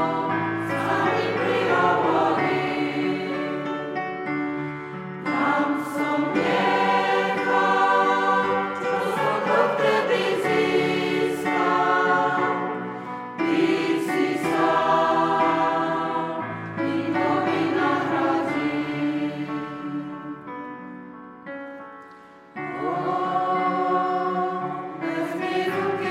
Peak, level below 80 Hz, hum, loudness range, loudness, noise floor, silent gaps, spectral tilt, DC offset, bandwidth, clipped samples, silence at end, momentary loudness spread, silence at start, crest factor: -6 dBFS; -66 dBFS; none; 7 LU; -23 LUFS; -46 dBFS; none; -6 dB/octave; under 0.1%; 15.5 kHz; under 0.1%; 0 s; 13 LU; 0 s; 16 dB